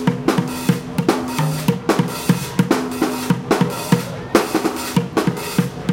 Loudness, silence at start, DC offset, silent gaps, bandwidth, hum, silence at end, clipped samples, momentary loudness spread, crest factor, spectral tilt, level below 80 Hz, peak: -19 LUFS; 0 s; under 0.1%; none; 17 kHz; none; 0 s; under 0.1%; 3 LU; 18 dB; -5.5 dB/octave; -48 dBFS; 0 dBFS